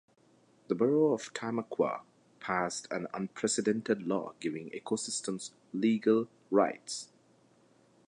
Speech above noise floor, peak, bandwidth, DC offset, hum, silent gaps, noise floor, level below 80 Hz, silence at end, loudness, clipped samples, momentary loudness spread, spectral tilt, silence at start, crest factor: 34 dB; -12 dBFS; 11 kHz; under 0.1%; none; none; -66 dBFS; -78 dBFS; 1.05 s; -32 LUFS; under 0.1%; 12 LU; -4.5 dB/octave; 0.7 s; 20 dB